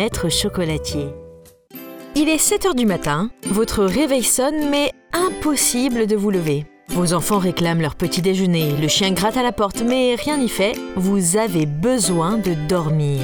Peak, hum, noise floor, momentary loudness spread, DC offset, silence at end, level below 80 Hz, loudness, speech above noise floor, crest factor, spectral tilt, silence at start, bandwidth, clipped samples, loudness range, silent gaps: -4 dBFS; none; -44 dBFS; 6 LU; under 0.1%; 0 s; -40 dBFS; -18 LUFS; 25 dB; 16 dB; -4.5 dB/octave; 0 s; over 20 kHz; under 0.1%; 2 LU; none